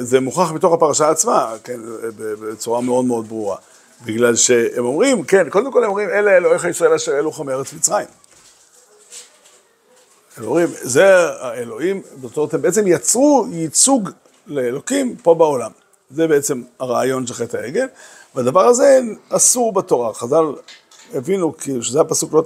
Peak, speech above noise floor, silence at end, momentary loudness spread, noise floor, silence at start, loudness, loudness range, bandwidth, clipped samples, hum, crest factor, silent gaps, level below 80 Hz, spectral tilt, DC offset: 0 dBFS; 37 dB; 0 s; 15 LU; -53 dBFS; 0 s; -16 LUFS; 5 LU; 16 kHz; under 0.1%; none; 16 dB; none; -68 dBFS; -3.5 dB/octave; under 0.1%